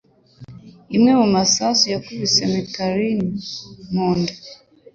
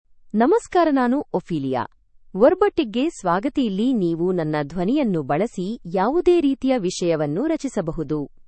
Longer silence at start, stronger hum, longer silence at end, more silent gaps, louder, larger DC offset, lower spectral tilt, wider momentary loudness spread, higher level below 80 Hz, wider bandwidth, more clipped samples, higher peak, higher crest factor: first, 0.4 s vs 0.25 s; neither; first, 0.4 s vs 0.05 s; neither; first, -18 LUFS vs -21 LUFS; neither; second, -4 dB/octave vs -6.5 dB/octave; first, 12 LU vs 8 LU; second, -54 dBFS vs -48 dBFS; second, 7.8 kHz vs 8.8 kHz; neither; about the same, -4 dBFS vs -4 dBFS; about the same, 16 dB vs 18 dB